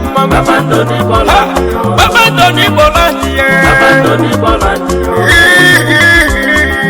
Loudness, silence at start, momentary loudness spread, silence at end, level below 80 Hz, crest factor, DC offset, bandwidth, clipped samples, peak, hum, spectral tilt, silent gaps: -7 LUFS; 0 s; 7 LU; 0 s; -22 dBFS; 8 dB; under 0.1%; over 20 kHz; 1%; 0 dBFS; none; -4.5 dB/octave; none